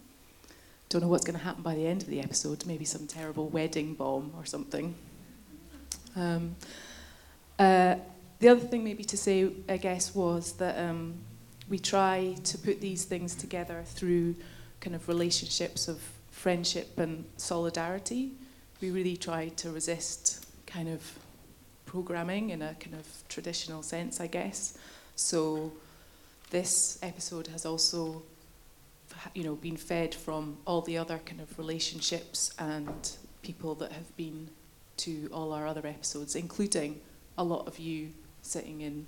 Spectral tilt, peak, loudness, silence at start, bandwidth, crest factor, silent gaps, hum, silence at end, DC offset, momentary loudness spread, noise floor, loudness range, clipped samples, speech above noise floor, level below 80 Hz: -4 dB/octave; -8 dBFS; -32 LUFS; 0 s; 18 kHz; 26 dB; none; none; 0 s; under 0.1%; 17 LU; -57 dBFS; 10 LU; under 0.1%; 25 dB; -58 dBFS